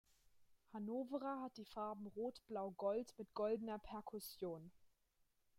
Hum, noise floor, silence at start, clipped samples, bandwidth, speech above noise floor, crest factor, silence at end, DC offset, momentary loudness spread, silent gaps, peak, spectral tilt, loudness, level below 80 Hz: none; -81 dBFS; 0.35 s; under 0.1%; 16 kHz; 35 dB; 18 dB; 0.7 s; under 0.1%; 9 LU; none; -30 dBFS; -6 dB/octave; -47 LUFS; -76 dBFS